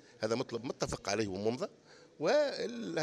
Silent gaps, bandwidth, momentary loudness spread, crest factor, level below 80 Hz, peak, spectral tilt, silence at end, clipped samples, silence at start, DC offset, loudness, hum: none; 12.5 kHz; 9 LU; 18 dB; -62 dBFS; -18 dBFS; -4.5 dB/octave; 0 s; under 0.1%; 0.15 s; under 0.1%; -35 LUFS; none